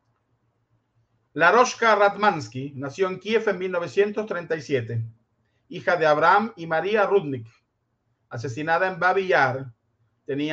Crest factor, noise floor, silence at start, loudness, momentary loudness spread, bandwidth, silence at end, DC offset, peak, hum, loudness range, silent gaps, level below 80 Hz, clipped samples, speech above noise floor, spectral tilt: 20 dB; -73 dBFS; 1.35 s; -22 LUFS; 16 LU; 8 kHz; 0 s; under 0.1%; -4 dBFS; none; 4 LU; none; -70 dBFS; under 0.1%; 51 dB; -5 dB/octave